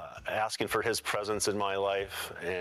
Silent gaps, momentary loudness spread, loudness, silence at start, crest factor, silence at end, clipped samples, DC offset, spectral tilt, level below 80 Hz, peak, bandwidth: none; 5 LU; -32 LUFS; 0 s; 20 dB; 0 s; under 0.1%; under 0.1%; -2.5 dB/octave; -60 dBFS; -14 dBFS; 15.5 kHz